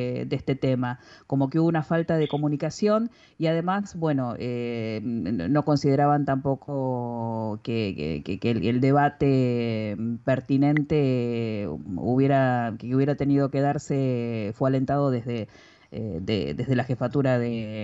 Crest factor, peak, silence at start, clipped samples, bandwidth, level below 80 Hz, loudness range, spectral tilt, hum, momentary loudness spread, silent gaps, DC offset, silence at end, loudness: 14 dB; -10 dBFS; 0 s; under 0.1%; 8 kHz; -54 dBFS; 3 LU; -8 dB/octave; none; 8 LU; none; under 0.1%; 0 s; -25 LUFS